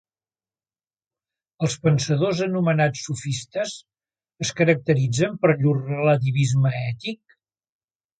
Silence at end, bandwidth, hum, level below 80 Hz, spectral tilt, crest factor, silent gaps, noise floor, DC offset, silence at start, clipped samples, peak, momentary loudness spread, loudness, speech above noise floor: 1.05 s; 9.4 kHz; none; -60 dBFS; -6 dB/octave; 18 dB; none; under -90 dBFS; under 0.1%; 1.6 s; under 0.1%; -4 dBFS; 9 LU; -22 LUFS; over 69 dB